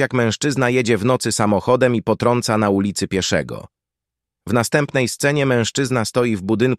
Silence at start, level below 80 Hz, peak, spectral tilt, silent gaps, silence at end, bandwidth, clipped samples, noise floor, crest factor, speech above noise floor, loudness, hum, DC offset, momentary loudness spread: 0 s; -52 dBFS; -2 dBFS; -5 dB/octave; none; 0 s; 14.5 kHz; under 0.1%; -85 dBFS; 16 dB; 67 dB; -18 LUFS; none; under 0.1%; 4 LU